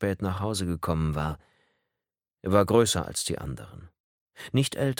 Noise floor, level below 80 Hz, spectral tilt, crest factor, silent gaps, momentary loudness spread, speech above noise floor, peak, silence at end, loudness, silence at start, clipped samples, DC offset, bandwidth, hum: -89 dBFS; -46 dBFS; -5 dB/octave; 22 dB; 4.00-4.26 s; 18 LU; 62 dB; -6 dBFS; 0.05 s; -27 LUFS; 0 s; under 0.1%; under 0.1%; 17.5 kHz; none